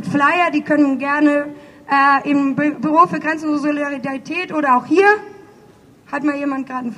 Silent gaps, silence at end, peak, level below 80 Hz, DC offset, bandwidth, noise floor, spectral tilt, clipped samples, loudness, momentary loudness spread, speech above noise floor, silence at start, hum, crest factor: none; 0 s; 0 dBFS; -64 dBFS; under 0.1%; 9.8 kHz; -47 dBFS; -6 dB/octave; under 0.1%; -16 LUFS; 9 LU; 30 dB; 0 s; none; 16 dB